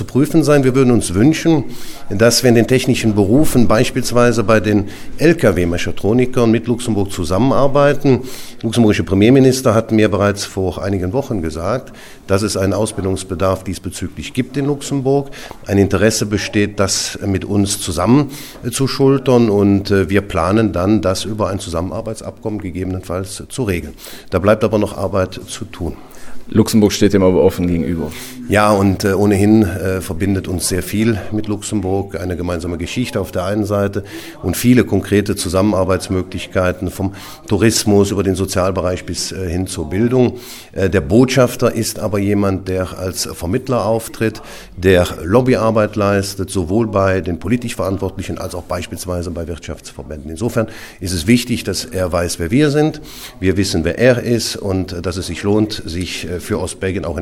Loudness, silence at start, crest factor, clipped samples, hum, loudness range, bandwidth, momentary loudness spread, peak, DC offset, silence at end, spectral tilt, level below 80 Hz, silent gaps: -16 LUFS; 0 s; 16 dB; under 0.1%; none; 6 LU; 18 kHz; 11 LU; 0 dBFS; under 0.1%; 0 s; -5.5 dB/octave; -36 dBFS; none